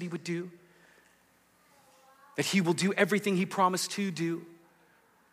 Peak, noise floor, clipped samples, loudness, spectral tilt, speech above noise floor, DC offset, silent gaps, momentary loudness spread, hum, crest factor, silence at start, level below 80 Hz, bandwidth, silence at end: -12 dBFS; -66 dBFS; under 0.1%; -30 LUFS; -4.5 dB/octave; 36 dB; under 0.1%; none; 11 LU; none; 20 dB; 0 s; -84 dBFS; 15.5 kHz; 0.8 s